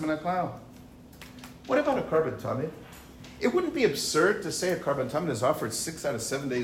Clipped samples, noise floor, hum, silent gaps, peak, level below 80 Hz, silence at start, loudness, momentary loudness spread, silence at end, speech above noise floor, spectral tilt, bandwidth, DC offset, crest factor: under 0.1%; -49 dBFS; none; none; -10 dBFS; -58 dBFS; 0 s; -28 LUFS; 21 LU; 0 s; 21 dB; -4.5 dB/octave; 16 kHz; under 0.1%; 18 dB